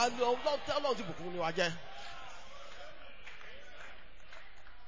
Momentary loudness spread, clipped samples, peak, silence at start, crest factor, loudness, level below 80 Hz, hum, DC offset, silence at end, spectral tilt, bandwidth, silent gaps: 21 LU; under 0.1%; -18 dBFS; 0 s; 20 dB; -35 LUFS; -62 dBFS; none; 0.8%; 0 s; -3.5 dB/octave; 7.6 kHz; none